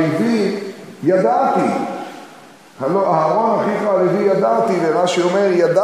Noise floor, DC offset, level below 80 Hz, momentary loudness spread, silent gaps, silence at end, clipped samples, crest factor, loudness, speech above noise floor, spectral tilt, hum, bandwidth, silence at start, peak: -42 dBFS; under 0.1%; -68 dBFS; 11 LU; none; 0 s; under 0.1%; 14 dB; -16 LUFS; 27 dB; -6 dB/octave; none; 13.5 kHz; 0 s; -2 dBFS